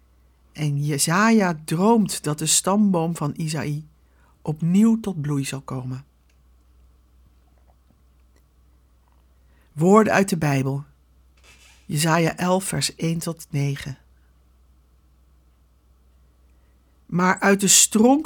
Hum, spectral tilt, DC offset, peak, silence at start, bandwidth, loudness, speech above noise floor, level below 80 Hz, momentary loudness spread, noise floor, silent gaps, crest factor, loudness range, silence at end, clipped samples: none; -4 dB/octave; under 0.1%; -2 dBFS; 0.55 s; 19 kHz; -20 LUFS; 37 dB; -56 dBFS; 16 LU; -57 dBFS; none; 22 dB; 13 LU; 0 s; under 0.1%